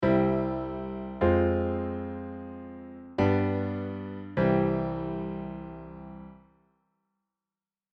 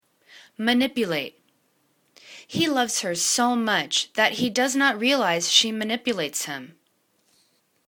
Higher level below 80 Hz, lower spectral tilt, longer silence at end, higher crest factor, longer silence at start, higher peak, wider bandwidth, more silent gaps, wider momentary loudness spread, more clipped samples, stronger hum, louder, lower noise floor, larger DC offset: first, -48 dBFS vs -70 dBFS; first, -10 dB/octave vs -2 dB/octave; first, 1.55 s vs 1.2 s; about the same, 18 dB vs 22 dB; second, 0 s vs 0.35 s; second, -12 dBFS vs -2 dBFS; second, 6.2 kHz vs 19 kHz; neither; first, 19 LU vs 10 LU; neither; neither; second, -29 LUFS vs -22 LUFS; first, under -90 dBFS vs -68 dBFS; neither